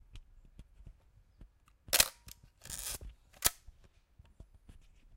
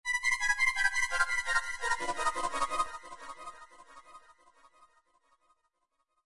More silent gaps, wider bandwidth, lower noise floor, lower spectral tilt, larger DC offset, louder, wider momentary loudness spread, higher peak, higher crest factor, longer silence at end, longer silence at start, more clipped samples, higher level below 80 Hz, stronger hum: neither; first, 17 kHz vs 11.5 kHz; second, -64 dBFS vs -80 dBFS; about the same, 0 dB/octave vs 0 dB/octave; neither; second, -33 LUFS vs -30 LUFS; first, 27 LU vs 19 LU; first, -6 dBFS vs -12 dBFS; first, 34 dB vs 22 dB; second, 0 s vs 2.05 s; about the same, 0.15 s vs 0.05 s; neither; about the same, -56 dBFS vs -54 dBFS; neither